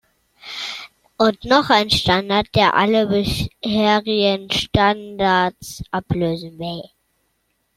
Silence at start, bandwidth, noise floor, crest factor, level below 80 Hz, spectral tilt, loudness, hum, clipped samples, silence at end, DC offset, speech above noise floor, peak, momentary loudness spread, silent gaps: 0.45 s; 15.5 kHz; -68 dBFS; 18 dB; -42 dBFS; -5 dB/octave; -18 LUFS; none; under 0.1%; 0.9 s; under 0.1%; 50 dB; 0 dBFS; 14 LU; none